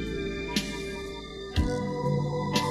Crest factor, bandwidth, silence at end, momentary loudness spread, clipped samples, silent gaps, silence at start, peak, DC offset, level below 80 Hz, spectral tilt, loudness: 18 dB; 15 kHz; 0 s; 9 LU; under 0.1%; none; 0 s; -12 dBFS; under 0.1%; -40 dBFS; -5.5 dB/octave; -31 LUFS